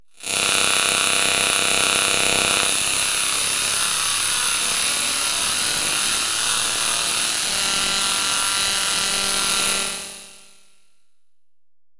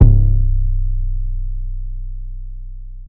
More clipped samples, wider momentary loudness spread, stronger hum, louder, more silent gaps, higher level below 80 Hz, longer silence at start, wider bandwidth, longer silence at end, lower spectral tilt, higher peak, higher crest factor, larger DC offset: second, under 0.1% vs 0.4%; second, 3 LU vs 19 LU; neither; first, -17 LUFS vs -21 LUFS; neither; second, -52 dBFS vs -16 dBFS; first, 0.2 s vs 0 s; first, 11.5 kHz vs 0.9 kHz; first, 1.5 s vs 0 s; second, 0.5 dB/octave vs -13.5 dB/octave; about the same, -2 dBFS vs 0 dBFS; about the same, 18 dB vs 16 dB; neither